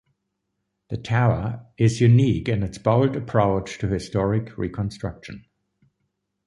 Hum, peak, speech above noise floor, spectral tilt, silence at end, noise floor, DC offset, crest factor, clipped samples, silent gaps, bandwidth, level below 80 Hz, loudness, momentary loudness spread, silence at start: none; -4 dBFS; 56 dB; -7.5 dB/octave; 1.05 s; -77 dBFS; under 0.1%; 20 dB; under 0.1%; none; 11 kHz; -44 dBFS; -22 LUFS; 16 LU; 0.9 s